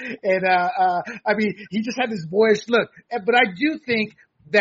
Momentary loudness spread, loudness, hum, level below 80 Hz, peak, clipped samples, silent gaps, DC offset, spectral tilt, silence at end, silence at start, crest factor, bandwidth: 8 LU; -21 LUFS; none; -68 dBFS; -4 dBFS; under 0.1%; none; under 0.1%; -2.5 dB/octave; 0 s; 0 s; 18 dB; 7.6 kHz